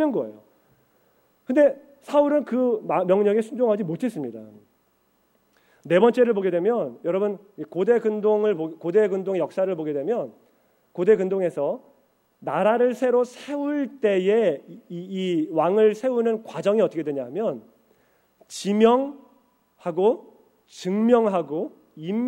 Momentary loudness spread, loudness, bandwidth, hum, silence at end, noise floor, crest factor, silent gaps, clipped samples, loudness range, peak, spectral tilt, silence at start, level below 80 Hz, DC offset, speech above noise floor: 14 LU; -23 LUFS; 16 kHz; none; 0 s; -66 dBFS; 18 dB; none; under 0.1%; 3 LU; -4 dBFS; -6.5 dB/octave; 0 s; -72 dBFS; under 0.1%; 44 dB